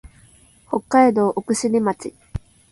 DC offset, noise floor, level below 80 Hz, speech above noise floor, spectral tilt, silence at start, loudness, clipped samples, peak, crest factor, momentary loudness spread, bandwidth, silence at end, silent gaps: under 0.1%; -52 dBFS; -46 dBFS; 33 dB; -5.5 dB/octave; 0.05 s; -19 LUFS; under 0.1%; -2 dBFS; 18 dB; 19 LU; 11.5 kHz; 0.35 s; none